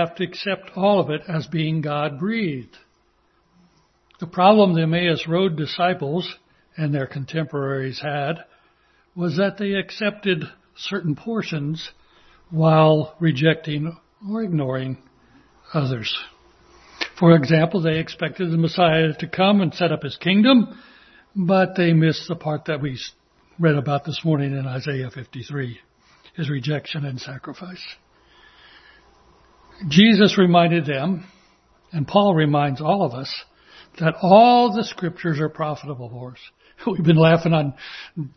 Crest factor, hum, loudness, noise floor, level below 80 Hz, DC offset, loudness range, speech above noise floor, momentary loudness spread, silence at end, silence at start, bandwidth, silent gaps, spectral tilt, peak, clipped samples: 20 dB; none; -20 LUFS; -62 dBFS; -58 dBFS; under 0.1%; 9 LU; 43 dB; 18 LU; 0.1 s; 0 s; 6.4 kHz; none; -7 dB/octave; 0 dBFS; under 0.1%